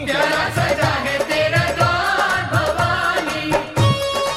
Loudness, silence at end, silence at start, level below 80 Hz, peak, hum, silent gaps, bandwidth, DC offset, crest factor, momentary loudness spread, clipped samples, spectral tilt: -18 LUFS; 0 s; 0 s; -40 dBFS; -4 dBFS; none; none; 16 kHz; under 0.1%; 16 dB; 3 LU; under 0.1%; -4.5 dB/octave